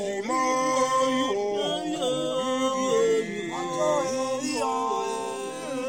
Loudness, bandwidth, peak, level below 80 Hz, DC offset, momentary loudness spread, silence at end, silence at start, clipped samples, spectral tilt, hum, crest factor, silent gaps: -26 LUFS; 16.5 kHz; -12 dBFS; -68 dBFS; 0.1%; 7 LU; 0 s; 0 s; under 0.1%; -3 dB/octave; none; 14 dB; none